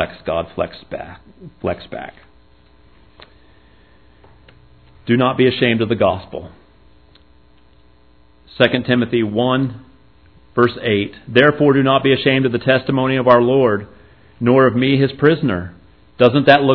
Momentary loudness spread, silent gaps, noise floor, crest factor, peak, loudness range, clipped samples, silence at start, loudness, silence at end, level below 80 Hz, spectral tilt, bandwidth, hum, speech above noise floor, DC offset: 17 LU; none; -52 dBFS; 18 dB; 0 dBFS; 14 LU; under 0.1%; 0 s; -16 LUFS; 0 s; -50 dBFS; -9 dB/octave; 5.4 kHz; none; 36 dB; 0.3%